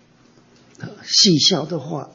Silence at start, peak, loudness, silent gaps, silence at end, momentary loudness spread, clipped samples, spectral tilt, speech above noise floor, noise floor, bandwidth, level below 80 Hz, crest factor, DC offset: 0.8 s; -4 dBFS; -15 LUFS; none; 0.1 s; 22 LU; under 0.1%; -3.5 dB/octave; 35 dB; -53 dBFS; 7.8 kHz; -62 dBFS; 16 dB; under 0.1%